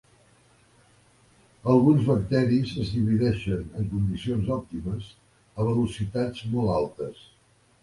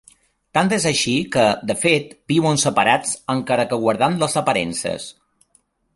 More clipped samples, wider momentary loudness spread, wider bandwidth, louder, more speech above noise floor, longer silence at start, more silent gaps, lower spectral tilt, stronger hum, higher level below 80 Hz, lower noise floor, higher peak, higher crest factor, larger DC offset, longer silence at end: neither; first, 13 LU vs 7 LU; about the same, 11.5 kHz vs 12 kHz; second, -26 LUFS vs -19 LUFS; second, 35 dB vs 43 dB; first, 1.65 s vs 0.55 s; neither; first, -8.5 dB/octave vs -4 dB/octave; neither; first, -46 dBFS vs -54 dBFS; about the same, -59 dBFS vs -62 dBFS; second, -8 dBFS vs -2 dBFS; about the same, 18 dB vs 18 dB; neither; second, 0.7 s vs 0.85 s